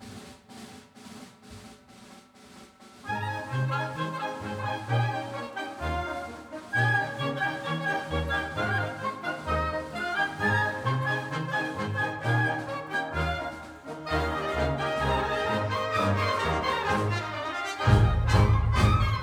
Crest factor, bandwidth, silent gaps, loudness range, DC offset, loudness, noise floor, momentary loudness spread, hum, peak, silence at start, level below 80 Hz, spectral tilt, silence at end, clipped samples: 20 dB; 14 kHz; none; 8 LU; under 0.1%; -28 LUFS; -51 dBFS; 18 LU; none; -8 dBFS; 0 s; -40 dBFS; -6 dB/octave; 0 s; under 0.1%